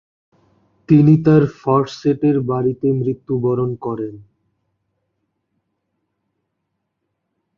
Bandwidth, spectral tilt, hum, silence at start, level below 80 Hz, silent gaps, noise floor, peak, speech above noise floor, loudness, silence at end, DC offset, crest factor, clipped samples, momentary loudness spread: 7 kHz; -9.5 dB/octave; none; 0.9 s; -54 dBFS; none; -75 dBFS; -2 dBFS; 59 dB; -17 LUFS; 3.35 s; under 0.1%; 18 dB; under 0.1%; 12 LU